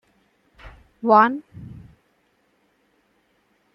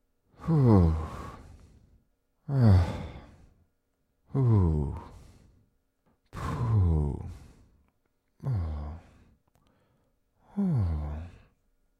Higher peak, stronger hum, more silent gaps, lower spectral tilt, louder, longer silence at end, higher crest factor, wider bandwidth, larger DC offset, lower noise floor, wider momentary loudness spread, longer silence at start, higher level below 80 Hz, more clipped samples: first, -2 dBFS vs -8 dBFS; neither; neither; second, -8 dB/octave vs -9.5 dB/octave; first, -18 LUFS vs -28 LUFS; first, 2 s vs 0.7 s; about the same, 22 dB vs 20 dB; second, 6 kHz vs 8.8 kHz; neither; second, -65 dBFS vs -75 dBFS; first, 26 LU vs 22 LU; first, 0.65 s vs 0.4 s; second, -56 dBFS vs -40 dBFS; neither